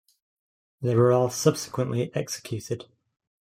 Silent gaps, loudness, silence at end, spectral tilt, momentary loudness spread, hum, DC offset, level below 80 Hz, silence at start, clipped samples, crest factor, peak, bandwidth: none; -26 LUFS; 0.6 s; -6 dB/octave; 12 LU; none; under 0.1%; -66 dBFS; 0.8 s; under 0.1%; 20 dB; -6 dBFS; 16 kHz